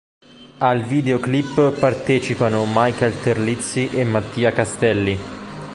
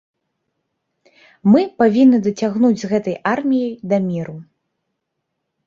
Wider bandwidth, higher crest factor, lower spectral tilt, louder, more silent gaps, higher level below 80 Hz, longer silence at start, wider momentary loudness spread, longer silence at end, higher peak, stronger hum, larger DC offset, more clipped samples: first, 11.5 kHz vs 7.4 kHz; about the same, 18 dB vs 16 dB; second, -6 dB/octave vs -7.5 dB/octave; about the same, -19 LUFS vs -17 LUFS; neither; first, -48 dBFS vs -60 dBFS; second, 0.4 s vs 1.45 s; second, 4 LU vs 8 LU; second, 0 s vs 1.25 s; about the same, -2 dBFS vs -2 dBFS; neither; neither; neither